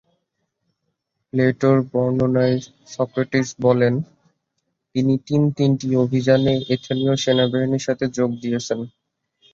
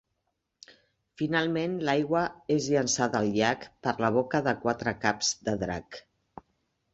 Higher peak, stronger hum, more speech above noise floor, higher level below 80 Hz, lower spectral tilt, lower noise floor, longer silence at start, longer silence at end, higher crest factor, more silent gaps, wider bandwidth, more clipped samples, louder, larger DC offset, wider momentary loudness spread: first, -2 dBFS vs -8 dBFS; neither; first, 56 dB vs 52 dB; about the same, -56 dBFS vs -60 dBFS; first, -6.5 dB/octave vs -4 dB/octave; second, -75 dBFS vs -80 dBFS; first, 1.35 s vs 1.2 s; second, 0.65 s vs 0.95 s; about the same, 18 dB vs 20 dB; neither; about the same, 7.6 kHz vs 8.2 kHz; neither; first, -20 LUFS vs -28 LUFS; neither; about the same, 9 LU vs 7 LU